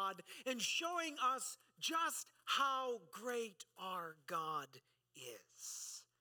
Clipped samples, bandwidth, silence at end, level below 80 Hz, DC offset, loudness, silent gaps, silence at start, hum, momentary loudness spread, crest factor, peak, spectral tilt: under 0.1%; 19 kHz; 0.15 s; under -90 dBFS; under 0.1%; -42 LUFS; none; 0 s; none; 13 LU; 20 dB; -24 dBFS; -1 dB/octave